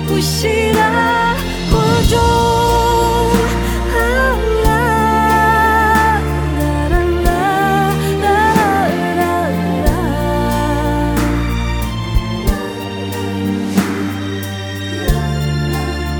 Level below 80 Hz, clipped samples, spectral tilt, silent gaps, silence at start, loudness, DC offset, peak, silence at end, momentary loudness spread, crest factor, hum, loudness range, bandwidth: -22 dBFS; under 0.1%; -5.5 dB/octave; none; 0 s; -15 LUFS; under 0.1%; 0 dBFS; 0 s; 8 LU; 14 dB; none; 6 LU; over 20 kHz